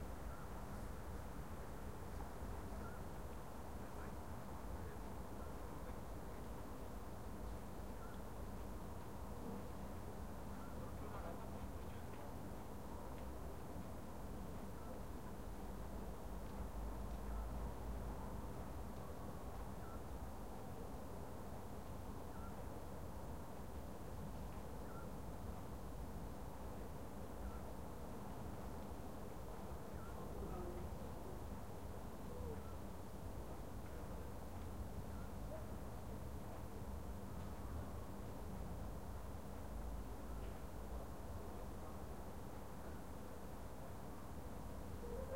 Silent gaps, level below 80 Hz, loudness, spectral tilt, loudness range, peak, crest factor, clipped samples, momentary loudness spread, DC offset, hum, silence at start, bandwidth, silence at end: none; -54 dBFS; -52 LUFS; -6.5 dB/octave; 2 LU; -34 dBFS; 16 dB; under 0.1%; 3 LU; 0.2%; none; 0 s; 16 kHz; 0 s